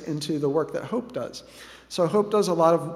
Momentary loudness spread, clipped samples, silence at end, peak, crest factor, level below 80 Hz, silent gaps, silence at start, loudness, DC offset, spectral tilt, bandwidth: 18 LU; under 0.1%; 0 s; -6 dBFS; 20 dB; -62 dBFS; none; 0 s; -25 LUFS; under 0.1%; -6 dB/octave; 14.5 kHz